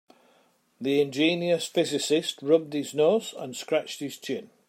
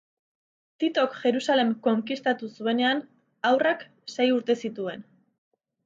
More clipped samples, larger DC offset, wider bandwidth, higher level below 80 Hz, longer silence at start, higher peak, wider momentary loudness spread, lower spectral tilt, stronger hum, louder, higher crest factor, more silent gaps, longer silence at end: neither; neither; first, 16 kHz vs 7.8 kHz; about the same, -78 dBFS vs -80 dBFS; about the same, 0.8 s vs 0.8 s; about the same, -8 dBFS vs -10 dBFS; about the same, 11 LU vs 10 LU; about the same, -4 dB/octave vs -4.5 dB/octave; neither; about the same, -26 LUFS vs -26 LUFS; about the same, 18 dB vs 16 dB; neither; second, 0.2 s vs 0.85 s